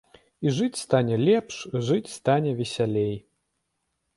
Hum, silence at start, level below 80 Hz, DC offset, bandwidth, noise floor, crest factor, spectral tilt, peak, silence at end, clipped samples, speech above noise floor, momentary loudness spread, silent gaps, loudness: none; 0.4 s; -62 dBFS; under 0.1%; 11.5 kHz; -77 dBFS; 18 dB; -6 dB/octave; -8 dBFS; 0.95 s; under 0.1%; 53 dB; 8 LU; none; -25 LUFS